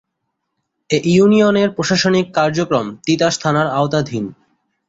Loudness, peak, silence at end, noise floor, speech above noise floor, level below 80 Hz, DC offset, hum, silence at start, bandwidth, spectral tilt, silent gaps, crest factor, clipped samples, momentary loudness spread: -15 LUFS; -2 dBFS; 0.55 s; -74 dBFS; 59 dB; -54 dBFS; under 0.1%; none; 0.9 s; 8 kHz; -5.5 dB/octave; none; 14 dB; under 0.1%; 8 LU